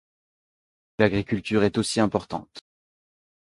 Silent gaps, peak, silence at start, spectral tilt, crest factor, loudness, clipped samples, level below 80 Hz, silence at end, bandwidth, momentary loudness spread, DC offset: none; -4 dBFS; 1 s; -5.5 dB/octave; 24 dB; -24 LUFS; under 0.1%; -52 dBFS; 0.95 s; 11.5 kHz; 13 LU; under 0.1%